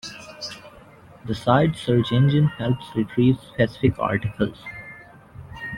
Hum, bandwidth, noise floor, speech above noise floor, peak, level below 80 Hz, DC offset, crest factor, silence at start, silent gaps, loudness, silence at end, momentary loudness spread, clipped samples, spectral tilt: none; 11.5 kHz; -47 dBFS; 26 dB; -2 dBFS; -48 dBFS; under 0.1%; 20 dB; 0.05 s; none; -22 LUFS; 0 s; 18 LU; under 0.1%; -7.5 dB/octave